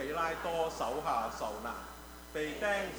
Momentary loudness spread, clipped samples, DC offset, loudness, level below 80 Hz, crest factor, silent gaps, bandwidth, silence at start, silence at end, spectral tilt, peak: 10 LU; under 0.1%; under 0.1%; -36 LUFS; -56 dBFS; 16 dB; none; over 20 kHz; 0 s; 0 s; -3.5 dB/octave; -20 dBFS